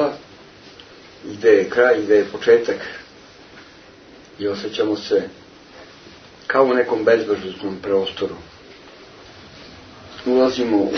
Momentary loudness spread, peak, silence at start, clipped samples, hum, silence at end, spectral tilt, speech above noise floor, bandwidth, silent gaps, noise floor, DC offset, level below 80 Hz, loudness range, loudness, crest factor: 23 LU; -2 dBFS; 0 s; under 0.1%; none; 0 s; -5 dB/octave; 27 dB; 6.6 kHz; none; -45 dBFS; under 0.1%; -58 dBFS; 8 LU; -19 LUFS; 20 dB